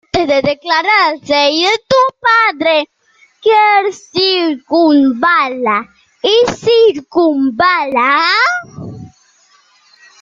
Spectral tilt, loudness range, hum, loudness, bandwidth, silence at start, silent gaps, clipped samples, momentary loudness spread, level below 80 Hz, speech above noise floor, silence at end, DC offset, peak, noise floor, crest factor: -4 dB/octave; 1 LU; none; -11 LUFS; 7.8 kHz; 0.15 s; none; under 0.1%; 7 LU; -52 dBFS; 39 dB; 1.15 s; under 0.1%; 0 dBFS; -51 dBFS; 12 dB